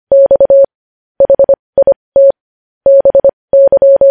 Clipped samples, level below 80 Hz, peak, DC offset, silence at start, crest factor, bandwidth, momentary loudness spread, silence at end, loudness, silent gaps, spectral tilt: under 0.1%; -44 dBFS; 0 dBFS; under 0.1%; 0.1 s; 8 dB; 1.8 kHz; 6 LU; 0 s; -8 LUFS; 0.75-1.15 s, 1.59-1.73 s, 1.96-2.12 s, 2.41-2.81 s, 3.33-3.48 s; -10.5 dB/octave